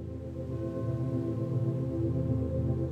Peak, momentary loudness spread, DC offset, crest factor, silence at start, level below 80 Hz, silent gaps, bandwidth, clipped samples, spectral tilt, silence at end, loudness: -18 dBFS; 6 LU; under 0.1%; 14 dB; 0 s; -46 dBFS; none; 4.8 kHz; under 0.1%; -11 dB/octave; 0 s; -33 LUFS